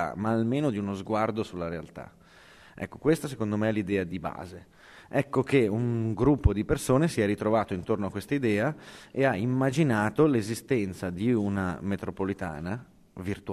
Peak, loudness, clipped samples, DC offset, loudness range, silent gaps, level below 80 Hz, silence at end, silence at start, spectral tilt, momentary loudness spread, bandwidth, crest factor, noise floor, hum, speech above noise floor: -8 dBFS; -28 LUFS; under 0.1%; under 0.1%; 5 LU; none; -44 dBFS; 0 s; 0 s; -7 dB/octave; 13 LU; 14 kHz; 20 dB; -54 dBFS; none; 26 dB